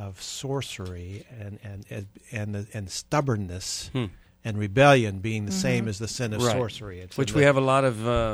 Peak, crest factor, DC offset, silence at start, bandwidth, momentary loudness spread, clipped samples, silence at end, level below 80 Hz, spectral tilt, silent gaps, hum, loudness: -6 dBFS; 20 dB; under 0.1%; 0 s; 15 kHz; 19 LU; under 0.1%; 0 s; -46 dBFS; -5 dB/octave; none; none; -25 LUFS